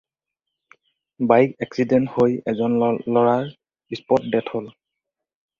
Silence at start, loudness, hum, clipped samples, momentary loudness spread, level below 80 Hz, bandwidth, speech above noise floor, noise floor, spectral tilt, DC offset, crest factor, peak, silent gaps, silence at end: 1.2 s; -20 LUFS; none; under 0.1%; 15 LU; -60 dBFS; 7 kHz; 64 dB; -84 dBFS; -8 dB/octave; under 0.1%; 20 dB; -2 dBFS; none; 0.9 s